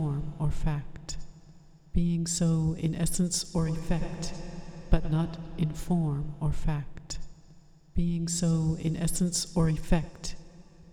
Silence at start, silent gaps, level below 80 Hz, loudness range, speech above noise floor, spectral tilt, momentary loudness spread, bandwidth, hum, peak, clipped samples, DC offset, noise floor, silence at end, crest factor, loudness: 0 s; none; -36 dBFS; 3 LU; 26 dB; -5.5 dB/octave; 14 LU; 15 kHz; none; -6 dBFS; under 0.1%; under 0.1%; -54 dBFS; 0 s; 22 dB; -30 LUFS